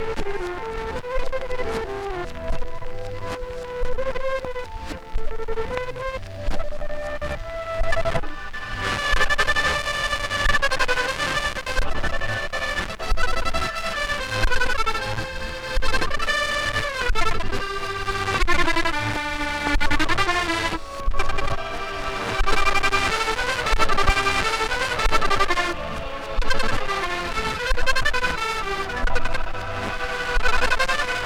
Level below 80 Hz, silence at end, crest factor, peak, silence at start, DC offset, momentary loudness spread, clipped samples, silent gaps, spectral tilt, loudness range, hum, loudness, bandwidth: -28 dBFS; 0 s; 14 dB; -6 dBFS; 0 s; under 0.1%; 11 LU; under 0.1%; none; -3.5 dB/octave; 8 LU; none; -24 LUFS; 12.5 kHz